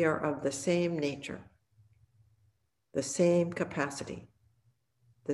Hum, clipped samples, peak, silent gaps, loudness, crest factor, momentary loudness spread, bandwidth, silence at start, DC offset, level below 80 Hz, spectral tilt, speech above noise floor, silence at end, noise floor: none; under 0.1%; -14 dBFS; none; -32 LUFS; 18 dB; 17 LU; 12.5 kHz; 0 s; under 0.1%; -68 dBFS; -5.5 dB/octave; 43 dB; 0 s; -74 dBFS